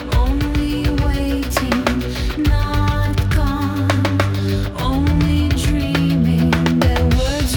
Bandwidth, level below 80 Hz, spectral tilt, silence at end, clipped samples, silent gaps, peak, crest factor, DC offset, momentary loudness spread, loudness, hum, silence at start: 19 kHz; -22 dBFS; -6 dB/octave; 0 s; under 0.1%; none; -2 dBFS; 14 dB; under 0.1%; 4 LU; -18 LUFS; none; 0 s